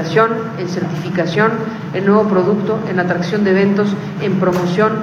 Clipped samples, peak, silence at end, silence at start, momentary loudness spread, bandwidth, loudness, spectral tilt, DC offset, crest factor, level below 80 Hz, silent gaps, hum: under 0.1%; 0 dBFS; 0 s; 0 s; 8 LU; 13 kHz; -16 LUFS; -7 dB/octave; under 0.1%; 16 dB; -56 dBFS; none; none